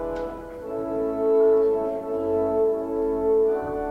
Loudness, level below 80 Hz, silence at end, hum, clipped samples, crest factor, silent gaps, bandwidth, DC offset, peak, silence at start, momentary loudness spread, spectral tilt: -23 LUFS; -48 dBFS; 0 s; none; under 0.1%; 12 dB; none; 4.2 kHz; under 0.1%; -12 dBFS; 0 s; 12 LU; -8.5 dB/octave